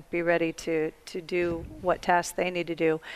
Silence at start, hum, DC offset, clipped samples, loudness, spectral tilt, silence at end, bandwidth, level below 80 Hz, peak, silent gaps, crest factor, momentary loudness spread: 0 s; none; under 0.1%; under 0.1%; -28 LUFS; -5 dB/octave; 0 s; 15.5 kHz; -52 dBFS; -8 dBFS; none; 20 dB; 6 LU